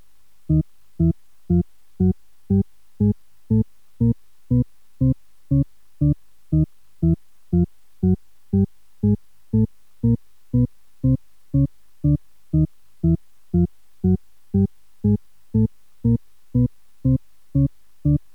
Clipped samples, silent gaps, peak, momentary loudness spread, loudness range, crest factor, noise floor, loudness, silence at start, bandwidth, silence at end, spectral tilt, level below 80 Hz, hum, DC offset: under 0.1%; none; -8 dBFS; 4 LU; 0 LU; 14 dB; -44 dBFS; -23 LUFS; 0.5 s; 1.8 kHz; 0.15 s; -12.5 dB/octave; -36 dBFS; none; 0.8%